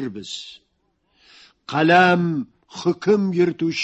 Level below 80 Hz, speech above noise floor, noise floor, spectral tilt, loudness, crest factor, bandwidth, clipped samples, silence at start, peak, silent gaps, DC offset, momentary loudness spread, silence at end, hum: -64 dBFS; 49 dB; -68 dBFS; -6 dB/octave; -19 LUFS; 20 dB; 8.2 kHz; under 0.1%; 0 s; -2 dBFS; none; under 0.1%; 18 LU; 0 s; none